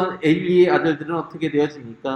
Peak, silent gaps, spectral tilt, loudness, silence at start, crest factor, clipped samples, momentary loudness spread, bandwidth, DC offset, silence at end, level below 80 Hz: -4 dBFS; none; -7.5 dB/octave; -19 LUFS; 0 s; 16 dB; under 0.1%; 10 LU; 8.2 kHz; under 0.1%; 0 s; -60 dBFS